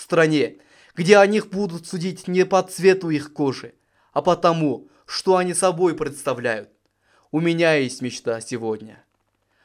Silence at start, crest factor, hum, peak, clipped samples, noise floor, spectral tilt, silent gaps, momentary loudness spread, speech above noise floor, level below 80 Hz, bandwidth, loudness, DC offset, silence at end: 0 s; 20 dB; none; 0 dBFS; under 0.1%; -69 dBFS; -5 dB/octave; none; 11 LU; 49 dB; -62 dBFS; 15 kHz; -21 LUFS; under 0.1%; 0.7 s